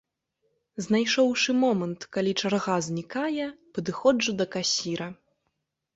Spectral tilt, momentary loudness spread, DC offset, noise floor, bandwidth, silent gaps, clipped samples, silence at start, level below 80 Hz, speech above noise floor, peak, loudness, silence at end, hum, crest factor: -4 dB/octave; 11 LU; under 0.1%; -79 dBFS; 8 kHz; none; under 0.1%; 0.75 s; -66 dBFS; 53 dB; -10 dBFS; -26 LUFS; 0.8 s; none; 18 dB